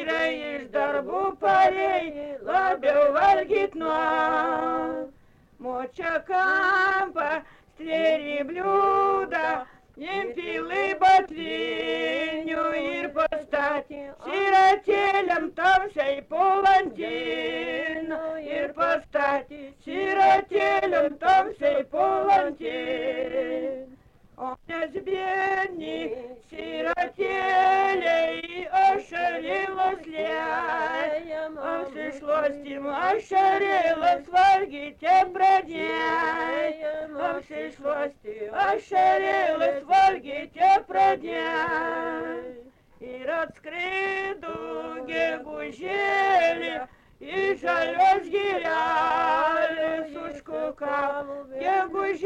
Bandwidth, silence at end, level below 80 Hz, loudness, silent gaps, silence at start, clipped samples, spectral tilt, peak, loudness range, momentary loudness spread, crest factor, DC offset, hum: 9 kHz; 0 s; -58 dBFS; -24 LUFS; none; 0 s; under 0.1%; -4 dB/octave; -10 dBFS; 6 LU; 13 LU; 14 dB; under 0.1%; none